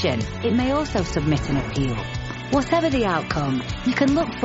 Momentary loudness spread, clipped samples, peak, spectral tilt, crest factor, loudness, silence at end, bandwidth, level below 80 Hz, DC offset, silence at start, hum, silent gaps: 5 LU; under 0.1%; -6 dBFS; -5 dB/octave; 16 dB; -23 LUFS; 0 s; 8 kHz; -36 dBFS; under 0.1%; 0 s; none; none